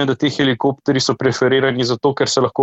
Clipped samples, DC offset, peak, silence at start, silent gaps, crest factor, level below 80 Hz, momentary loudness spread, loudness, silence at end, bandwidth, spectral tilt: under 0.1%; under 0.1%; -2 dBFS; 0 s; none; 14 dB; -56 dBFS; 3 LU; -17 LUFS; 0 s; 8.2 kHz; -4.5 dB/octave